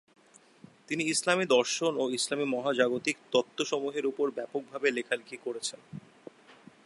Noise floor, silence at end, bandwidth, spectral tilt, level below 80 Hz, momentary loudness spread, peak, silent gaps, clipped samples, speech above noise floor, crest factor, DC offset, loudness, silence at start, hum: -57 dBFS; 0.35 s; 11.5 kHz; -3 dB/octave; -82 dBFS; 11 LU; -10 dBFS; none; under 0.1%; 27 dB; 22 dB; under 0.1%; -30 LUFS; 0.9 s; none